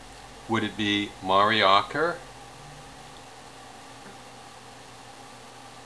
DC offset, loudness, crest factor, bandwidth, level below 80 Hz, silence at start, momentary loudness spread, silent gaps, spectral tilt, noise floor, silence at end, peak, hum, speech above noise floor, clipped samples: 0.1%; -24 LUFS; 24 dB; 11 kHz; -58 dBFS; 0 s; 24 LU; none; -4 dB/octave; -46 dBFS; 0 s; -6 dBFS; none; 22 dB; under 0.1%